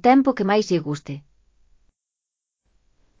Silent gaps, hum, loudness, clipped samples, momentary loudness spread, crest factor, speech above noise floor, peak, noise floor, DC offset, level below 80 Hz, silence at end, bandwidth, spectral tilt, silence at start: none; none; -21 LUFS; under 0.1%; 19 LU; 20 dB; 65 dB; -4 dBFS; -85 dBFS; under 0.1%; -60 dBFS; 2 s; 7.6 kHz; -6.5 dB/octave; 0.05 s